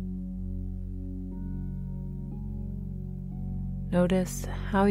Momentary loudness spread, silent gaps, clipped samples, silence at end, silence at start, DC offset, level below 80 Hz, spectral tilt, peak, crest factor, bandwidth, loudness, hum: 12 LU; none; under 0.1%; 0 s; 0 s; under 0.1%; -38 dBFS; -7 dB/octave; -12 dBFS; 18 dB; 16 kHz; -33 LUFS; none